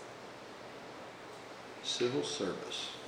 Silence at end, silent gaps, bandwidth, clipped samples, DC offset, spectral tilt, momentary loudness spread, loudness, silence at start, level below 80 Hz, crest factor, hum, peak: 0 s; none; 16 kHz; under 0.1%; under 0.1%; -3 dB/octave; 15 LU; -39 LUFS; 0 s; -76 dBFS; 18 dB; none; -22 dBFS